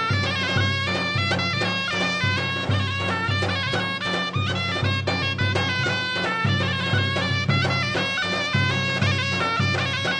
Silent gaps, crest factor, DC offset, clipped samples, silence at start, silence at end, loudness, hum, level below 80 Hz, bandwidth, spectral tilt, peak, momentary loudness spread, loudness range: none; 14 dB; under 0.1%; under 0.1%; 0 s; 0 s; -22 LUFS; none; -54 dBFS; 9.8 kHz; -4.5 dB/octave; -8 dBFS; 2 LU; 1 LU